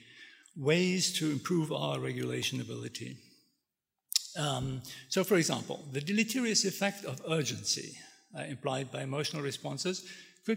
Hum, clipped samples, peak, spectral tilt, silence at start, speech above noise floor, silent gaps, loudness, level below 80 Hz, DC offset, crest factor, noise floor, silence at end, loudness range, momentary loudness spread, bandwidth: none; under 0.1%; -8 dBFS; -4 dB/octave; 0 s; 55 dB; none; -33 LUFS; -70 dBFS; under 0.1%; 26 dB; -88 dBFS; 0 s; 4 LU; 15 LU; 16 kHz